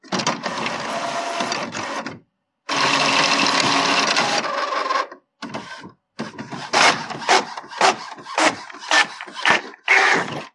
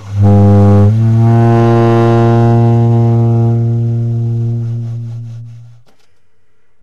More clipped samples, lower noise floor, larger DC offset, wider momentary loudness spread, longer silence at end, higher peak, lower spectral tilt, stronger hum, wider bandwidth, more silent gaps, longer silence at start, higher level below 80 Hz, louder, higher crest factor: neither; about the same, -59 dBFS vs -61 dBFS; neither; first, 17 LU vs 14 LU; second, 0.05 s vs 1.2 s; about the same, 0 dBFS vs -2 dBFS; second, -1.5 dB/octave vs -10 dB/octave; neither; first, 11.5 kHz vs 6.4 kHz; neither; about the same, 0.05 s vs 0 s; second, -72 dBFS vs -38 dBFS; second, -19 LUFS vs -10 LUFS; first, 20 dB vs 8 dB